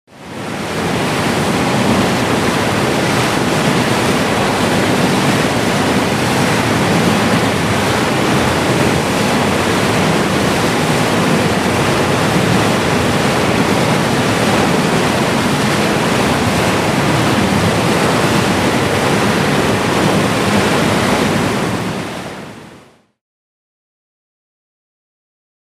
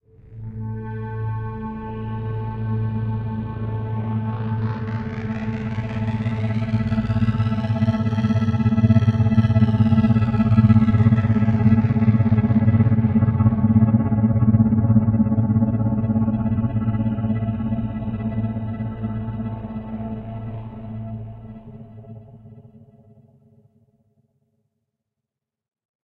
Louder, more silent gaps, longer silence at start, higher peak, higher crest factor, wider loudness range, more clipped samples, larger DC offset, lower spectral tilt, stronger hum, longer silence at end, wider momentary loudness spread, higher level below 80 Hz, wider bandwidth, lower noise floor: first, -14 LUFS vs -20 LUFS; neither; second, 0.15 s vs 0.3 s; about the same, 0 dBFS vs -2 dBFS; about the same, 14 dB vs 18 dB; second, 2 LU vs 14 LU; neither; neither; second, -4.5 dB/octave vs -10.5 dB/octave; neither; second, 2.95 s vs 3.45 s; second, 2 LU vs 14 LU; about the same, -38 dBFS vs -40 dBFS; first, 15.5 kHz vs 4.9 kHz; second, -43 dBFS vs -85 dBFS